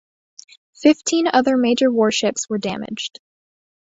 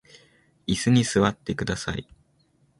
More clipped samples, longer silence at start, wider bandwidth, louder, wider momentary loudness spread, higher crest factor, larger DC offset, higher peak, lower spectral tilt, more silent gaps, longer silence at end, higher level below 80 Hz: neither; about the same, 0.8 s vs 0.7 s; second, 8 kHz vs 11.5 kHz; first, -18 LUFS vs -24 LUFS; about the same, 11 LU vs 13 LU; about the same, 18 dB vs 18 dB; neither; first, -2 dBFS vs -8 dBFS; second, -3.5 dB/octave vs -5 dB/octave; neither; about the same, 0.8 s vs 0.8 s; second, -62 dBFS vs -48 dBFS